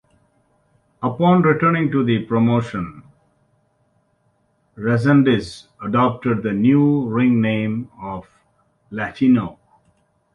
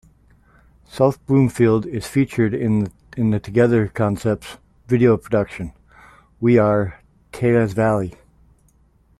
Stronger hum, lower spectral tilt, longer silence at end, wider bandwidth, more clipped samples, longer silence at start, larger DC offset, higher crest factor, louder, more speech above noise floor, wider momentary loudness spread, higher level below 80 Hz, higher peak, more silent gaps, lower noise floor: neither; about the same, -8.5 dB/octave vs -8 dB/octave; second, 0.85 s vs 1.1 s; second, 10.5 kHz vs 13.5 kHz; neither; about the same, 1 s vs 0.95 s; neither; about the same, 16 dB vs 16 dB; about the same, -18 LUFS vs -19 LUFS; first, 46 dB vs 39 dB; first, 17 LU vs 12 LU; about the same, -52 dBFS vs -48 dBFS; about the same, -4 dBFS vs -2 dBFS; neither; first, -64 dBFS vs -57 dBFS